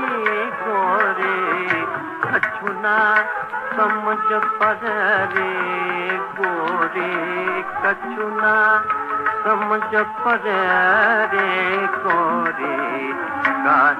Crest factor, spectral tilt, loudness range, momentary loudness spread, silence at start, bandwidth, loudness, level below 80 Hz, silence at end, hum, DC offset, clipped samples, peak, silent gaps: 16 dB; -5.5 dB/octave; 3 LU; 7 LU; 0 s; 13.5 kHz; -19 LUFS; -66 dBFS; 0 s; none; under 0.1%; under 0.1%; -4 dBFS; none